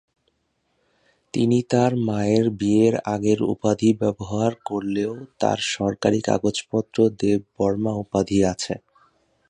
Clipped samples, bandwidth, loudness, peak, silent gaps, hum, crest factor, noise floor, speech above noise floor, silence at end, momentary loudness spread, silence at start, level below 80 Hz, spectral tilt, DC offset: under 0.1%; 10.5 kHz; -22 LUFS; -4 dBFS; none; none; 18 dB; -71 dBFS; 49 dB; 0.7 s; 6 LU; 1.35 s; -52 dBFS; -6 dB/octave; under 0.1%